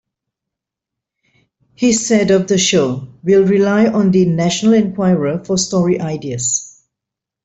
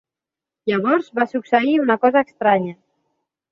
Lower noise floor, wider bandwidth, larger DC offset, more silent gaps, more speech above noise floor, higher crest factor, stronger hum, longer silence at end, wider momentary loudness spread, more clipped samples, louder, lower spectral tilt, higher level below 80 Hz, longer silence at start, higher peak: second, -83 dBFS vs -87 dBFS; first, 8.2 kHz vs 7.2 kHz; neither; neither; about the same, 70 dB vs 70 dB; about the same, 14 dB vs 18 dB; neither; about the same, 0.75 s vs 0.8 s; about the same, 7 LU vs 6 LU; neither; first, -14 LUFS vs -18 LUFS; second, -5 dB/octave vs -7.5 dB/octave; first, -52 dBFS vs -66 dBFS; first, 1.8 s vs 0.65 s; about the same, -2 dBFS vs -2 dBFS